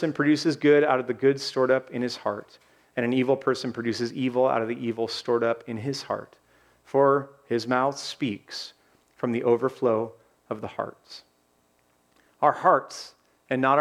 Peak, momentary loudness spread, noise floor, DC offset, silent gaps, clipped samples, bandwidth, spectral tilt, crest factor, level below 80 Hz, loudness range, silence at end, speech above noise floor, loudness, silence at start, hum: -6 dBFS; 15 LU; -66 dBFS; under 0.1%; none; under 0.1%; 13 kHz; -5.5 dB/octave; 20 dB; -74 dBFS; 5 LU; 0 s; 42 dB; -25 LUFS; 0 s; none